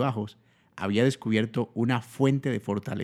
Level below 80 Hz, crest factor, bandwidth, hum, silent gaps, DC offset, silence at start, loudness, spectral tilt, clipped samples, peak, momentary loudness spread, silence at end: -70 dBFS; 18 dB; 13.5 kHz; none; none; under 0.1%; 0 s; -27 LUFS; -7 dB/octave; under 0.1%; -10 dBFS; 9 LU; 0 s